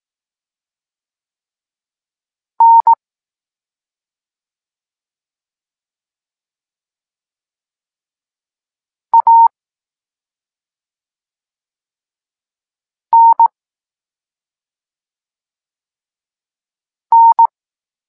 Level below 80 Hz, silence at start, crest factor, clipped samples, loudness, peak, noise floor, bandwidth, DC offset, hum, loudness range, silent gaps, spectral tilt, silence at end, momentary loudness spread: -86 dBFS; 2.6 s; 16 dB; under 0.1%; -10 LUFS; -2 dBFS; under -90 dBFS; 1.7 kHz; under 0.1%; none; 2 LU; none; -2 dB/octave; 0.6 s; 6 LU